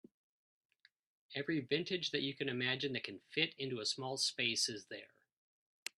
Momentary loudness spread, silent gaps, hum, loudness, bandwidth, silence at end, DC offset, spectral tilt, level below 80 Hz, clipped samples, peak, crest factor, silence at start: 13 LU; none; none; -38 LUFS; 12.5 kHz; 0.95 s; under 0.1%; -3 dB/octave; -82 dBFS; under 0.1%; -16 dBFS; 24 dB; 1.3 s